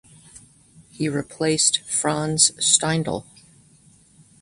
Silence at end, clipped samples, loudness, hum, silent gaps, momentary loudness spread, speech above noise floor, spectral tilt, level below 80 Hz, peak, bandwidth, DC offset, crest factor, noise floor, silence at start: 1.2 s; under 0.1%; -20 LUFS; none; none; 11 LU; 33 dB; -2.5 dB/octave; -58 dBFS; -2 dBFS; 11.5 kHz; under 0.1%; 22 dB; -54 dBFS; 0.35 s